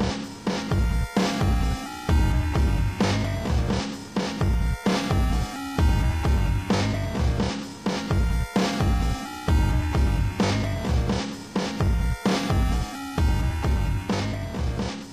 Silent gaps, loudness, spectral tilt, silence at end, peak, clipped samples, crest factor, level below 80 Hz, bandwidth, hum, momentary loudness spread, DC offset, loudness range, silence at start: none; -25 LUFS; -6 dB/octave; 0 s; -10 dBFS; under 0.1%; 14 dB; -26 dBFS; 15.5 kHz; none; 6 LU; 0.1%; 1 LU; 0 s